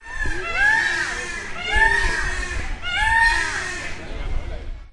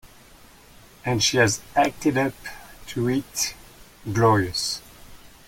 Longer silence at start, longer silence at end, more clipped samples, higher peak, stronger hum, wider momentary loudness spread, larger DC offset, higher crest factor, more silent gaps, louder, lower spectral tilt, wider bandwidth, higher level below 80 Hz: about the same, 0 s vs 0.05 s; second, 0 s vs 0.2 s; neither; about the same, -6 dBFS vs -6 dBFS; neither; about the same, 15 LU vs 16 LU; neither; about the same, 16 dB vs 18 dB; neither; first, -20 LUFS vs -23 LUFS; second, -2.5 dB/octave vs -4 dB/octave; second, 11.5 kHz vs 17 kHz; first, -30 dBFS vs -52 dBFS